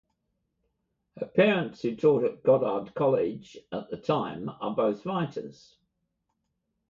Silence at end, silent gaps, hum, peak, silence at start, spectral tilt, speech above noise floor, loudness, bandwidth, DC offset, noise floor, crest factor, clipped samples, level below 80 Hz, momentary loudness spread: 1.4 s; none; none; -8 dBFS; 1.15 s; -7.5 dB/octave; 52 dB; -27 LUFS; 7.2 kHz; under 0.1%; -79 dBFS; 20 dB; under 0.1%; -68 dBFS; 14 LU